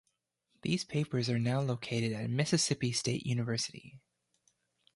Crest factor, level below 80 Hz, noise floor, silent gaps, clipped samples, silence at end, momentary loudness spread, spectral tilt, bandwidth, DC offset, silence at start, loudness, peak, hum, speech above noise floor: 18 dB; -68 dBFS; -80 dBFS; none; under 0.1%; 1 s; 6 LU; -4.5 dB/octave; 11.5 kHz; under 0.1%; 0.65 s; -33 LUFS; -16 dBFS; none; 47 dB